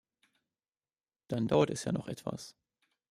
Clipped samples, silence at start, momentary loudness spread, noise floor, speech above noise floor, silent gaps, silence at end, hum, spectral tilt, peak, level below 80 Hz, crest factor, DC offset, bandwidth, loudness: under 0.1%; 1.3 s; 16 LU; under -90 dBFS; over 57 dB; none; 0.6 s; none; -6 dB/octave; -14 dBFS; -66 dBFS; 24 dB; under 0.1%; 14.5 kHz; -33 LUFS